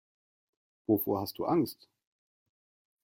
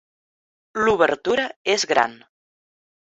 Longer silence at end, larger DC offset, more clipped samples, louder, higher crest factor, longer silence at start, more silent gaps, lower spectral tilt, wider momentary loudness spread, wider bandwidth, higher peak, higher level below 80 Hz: first, 1.3 s vs 0.9 s; neither; neither; second, -31 LUFS vs -20 LUFS; about the same, 20 dB vs 20 dB; first, 0.9 s vs 0.75 s; second, none vs 1.56-1.65 s; first, -7 dB/octave vs -2.5 dB/octave; first, 13 LU vs 6 LU; first, 16.5 kHz vs 8.2 kHz; second, -16 dBFS vs -4 dBFS; second, -72 dBFS vs -58 dBFS